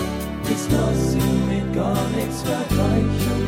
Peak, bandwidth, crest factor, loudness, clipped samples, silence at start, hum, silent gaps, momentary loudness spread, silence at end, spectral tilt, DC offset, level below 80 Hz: -8 dBFS; 16 kHz; 14 dB; -21 LUFS; under 0.1%; 0 s; none; none; 5 LU; 0 s; -6 dB/octave; under 0.1%; -32 dBFS